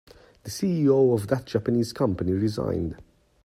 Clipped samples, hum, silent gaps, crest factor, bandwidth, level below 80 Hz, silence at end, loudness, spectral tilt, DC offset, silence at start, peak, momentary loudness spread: under 0.1%; none; none; 18 dB; 15.5 kHz; -52 dBFS; 0.4 s; -25 LUFS; -7 dB/octave; under 0.1%; 0.45 s; -8 dBFS; 11 LU